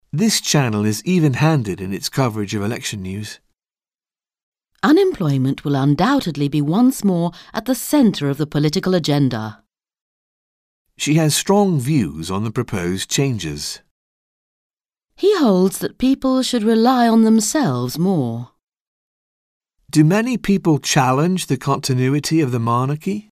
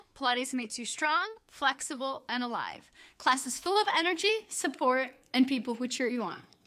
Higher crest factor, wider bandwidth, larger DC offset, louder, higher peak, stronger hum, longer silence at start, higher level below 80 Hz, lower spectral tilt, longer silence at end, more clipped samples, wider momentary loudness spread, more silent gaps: about the same, 18 dB vs 20 dB; about the same, 15.5 kHz vs 15.5 kHz; neither; first, -18 LUFS vs -30 LUFS; first, -2 dBFS vs -12 dBFS; neither; about the same, 0.15 s vs 0.15 s; first, -50 dBFS vs -76 dBFS; first, -5.5 dB/octave vs -1.5 dB/octave; second, 0.1 s vs 0.25 s; neither; about the same, 9 LU vs 8 LU; first, 4.43-4.52 s, 10.01-10.85 s, 13.91-14.70 s, 18.63-18.67 s, 18.81-19.61 s vs none